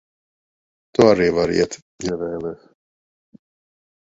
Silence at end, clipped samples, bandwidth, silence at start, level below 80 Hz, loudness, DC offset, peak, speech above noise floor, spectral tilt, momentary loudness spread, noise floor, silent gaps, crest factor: 1.6 s; under 0.1%; 7.8 kHz; 1 s; -50 dBFS; -19 LUFS; under 0.1%; 0 dBFS; over 71 dB; -5.5 dB/octave; 15 LU; under -90 dBFS; 1.82-1.99 s; 22 dB